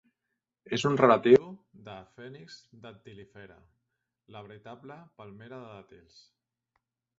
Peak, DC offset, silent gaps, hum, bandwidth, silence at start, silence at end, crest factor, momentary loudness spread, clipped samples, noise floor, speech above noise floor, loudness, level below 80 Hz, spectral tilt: -8 dBFS; under 0.1%; none; none; 7.8 kHz; 0.7 s; 1.55 s; 24 dB; 27 LU; under 0.1%; -85 dBFS; 56 dB; -23 LUFS; -70 dBFS; -6 dB/octave